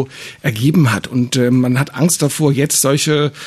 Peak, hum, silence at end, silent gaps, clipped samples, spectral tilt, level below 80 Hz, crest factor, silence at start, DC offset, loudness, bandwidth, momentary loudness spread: -2 dBFS; none; 0 s; none; under 0.1%; -5 dB/octave; -54 dBFS; 12 dB; 0 s; under 0.1%; -14 LUFS; 14 kHz; 5 LU